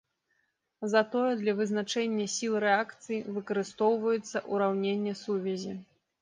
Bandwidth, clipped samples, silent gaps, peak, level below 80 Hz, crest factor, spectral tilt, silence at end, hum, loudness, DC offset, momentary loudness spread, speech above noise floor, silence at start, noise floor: 10 kHz; under 0.1%; none; -12 dBFS; -78 dBFS; 18 dB; -4.5 dB/octave; 0.4 s; none; -30 LUFS; under 0.1%; 8 LU; 47 dB; 0.8 s; -76 dBFS